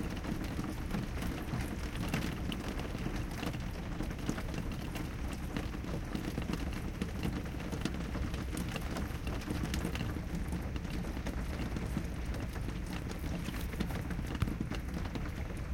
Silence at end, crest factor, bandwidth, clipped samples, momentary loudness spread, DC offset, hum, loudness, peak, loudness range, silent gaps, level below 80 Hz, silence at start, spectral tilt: 0 s; 20 dB; 17 kHz; under 0.1%; 3 LU; under 0.1%; none; -39 LUFS; -18 dBFS; 1 LU; none; -42 dBFS; 0 s; -6 dB/octave